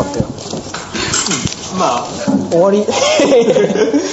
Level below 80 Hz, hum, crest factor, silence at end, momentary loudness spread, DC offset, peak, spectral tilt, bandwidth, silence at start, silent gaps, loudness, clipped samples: -42 dBFS; none; 12 dB; 0 s; 11 LU; under 0.1%; 0 dBFS; -4 dB/octave; 8.2 kHz; 0 s; none; -14 LUFS; under 0.1%